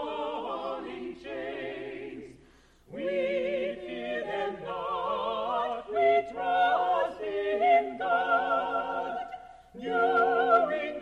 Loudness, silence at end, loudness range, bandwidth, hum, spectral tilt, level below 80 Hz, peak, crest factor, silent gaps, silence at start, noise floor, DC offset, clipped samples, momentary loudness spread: -29 LUFS; 0 s; 8 LU; 7.6 kHz; none; -5.5 dB/octave; -62 dBFS; -10 dBFS; 20 dB; none; 0 s; -59 dBFS; under 0.1%; under 0.1%; 15 LU